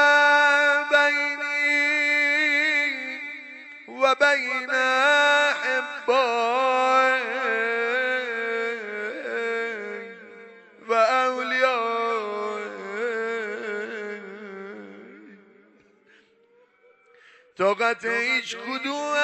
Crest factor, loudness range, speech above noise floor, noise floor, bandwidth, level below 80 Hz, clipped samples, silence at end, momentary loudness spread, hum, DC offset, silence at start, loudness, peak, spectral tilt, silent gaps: 16 dB; 12 LU; 34 dB; -60 dBFS; 15 kHz; -80 dBFS; under 0.1%; 0 s; 17 LU; none; under 0.1%; 0 s; -22 LUFS; -8 dBFS; -2 dB/octave; none